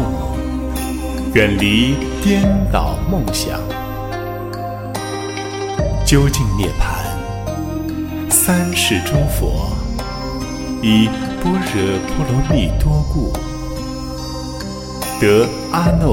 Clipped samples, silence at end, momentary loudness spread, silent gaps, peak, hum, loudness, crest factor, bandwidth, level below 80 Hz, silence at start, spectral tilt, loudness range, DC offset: under 0.1%; 0 s; 11 LU; none; 0 dBFS; none; -18 LUFS; 16 dB; 17 kHz; -24 dBFS; 0 s; -5 dB/octave; 3 LU; under 0.1%